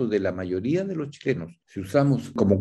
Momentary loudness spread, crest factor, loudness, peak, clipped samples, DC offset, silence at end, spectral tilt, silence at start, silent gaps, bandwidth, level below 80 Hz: 9 LU; 18 dB; -25 LUFS; -6 dBFS; under 0.1%; under 0.1%; 0 s; -8 dB/octave; 0 s; none; 12.5 kHz; -60 dBFS